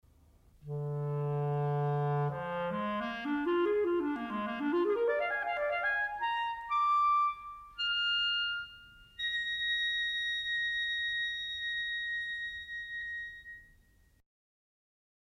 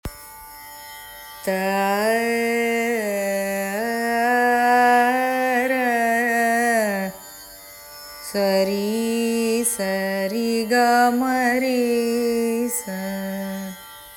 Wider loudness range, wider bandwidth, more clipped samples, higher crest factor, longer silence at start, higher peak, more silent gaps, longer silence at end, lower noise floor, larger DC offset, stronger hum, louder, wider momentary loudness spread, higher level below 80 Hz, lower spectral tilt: about the same, 5 LU vs 4 LU; second, 10 kHz vs 18.5 kHz; neither; about the same, 14 dB vs 14 dB; first, 0.65 s vs 0.05 s; second, -20 dBFS vs -8 dBFS; neither; first, 1.55 s vs 0 s; first, -65 dBFS vs -41 dBFS; neither; neither; second, -32 LUFS vs -20 LUFS; second, 10 LU vs 20 LU; second, -64 dBFS vs -54 dBFS; first, -6 dB/octave vs -4 dB/octave